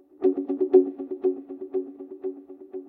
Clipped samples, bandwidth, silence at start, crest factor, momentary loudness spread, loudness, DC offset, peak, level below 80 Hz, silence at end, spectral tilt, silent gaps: under 0.1%; 2.7 kHz; 0.2 s; 20 dB; 18 LU; -26 LUFS; under 0.1%; -6 dBFS; -76 dBFS; 0 s; -10 dB/octave; none